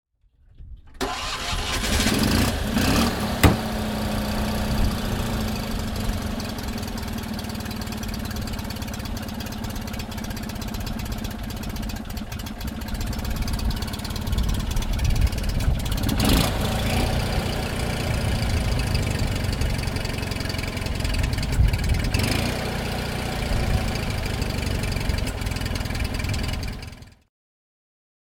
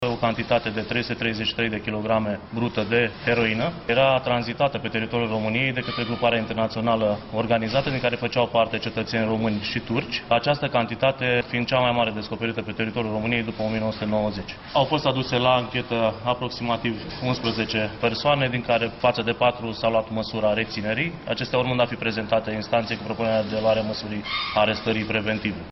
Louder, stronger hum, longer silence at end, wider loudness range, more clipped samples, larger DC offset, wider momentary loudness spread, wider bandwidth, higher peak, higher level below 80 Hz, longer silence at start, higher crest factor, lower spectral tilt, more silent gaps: about the same, -26 LUFS vs -24 LUFS; neither; first, 1.2 s vs 0 s; first, 8 LU vs 1 LU; neither; neither; first, 10 LU vs 6 LU; first, 18 kHz vs 6.2 kHz; first, -2 dBFS vs -6 dBFS; first, -30 dBFS vs -50 dBFS; first, 0.6 s vs 0 s; first, 24 dB vs 18 dB; second, -5 dB/octave vs -6.5 dB/octave; neither